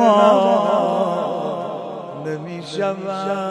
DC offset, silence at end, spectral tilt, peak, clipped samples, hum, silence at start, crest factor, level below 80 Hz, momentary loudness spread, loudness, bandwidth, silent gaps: under 0.1%; 0 s; -6 dB/octave; 0 dBFS; under 0.1%; none; 0 s; 18 dB; -70 dBFS; 15 LU; -20 LUFS; 11 kHz; none